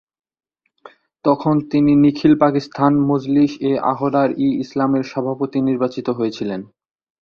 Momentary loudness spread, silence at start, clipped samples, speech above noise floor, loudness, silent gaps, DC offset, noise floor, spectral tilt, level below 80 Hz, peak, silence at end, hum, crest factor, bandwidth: 8 LU; 1.25 s; under 0.1%; 29 dB; -18 LUFS; none; under 0.1%; -46 dBFS; -8.5 dB/octave; -56 dBFS; -2 dBFS; 0.55 s; none; 16 dB; 6.8 kHz